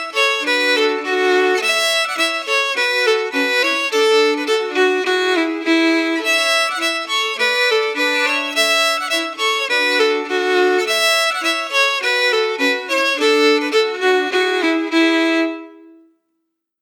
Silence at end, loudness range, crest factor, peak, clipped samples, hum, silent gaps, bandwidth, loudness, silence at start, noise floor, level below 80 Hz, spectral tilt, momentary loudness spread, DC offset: 1.05 s; 1 LU; 14 dB; -4 dBFS; under 0.1%; none; none; 20 kHz; -16 LUFS; 0 s; -73 dBFS; under -90 dBFS; 0.5 dB/octave; 4 LU; under 0.1%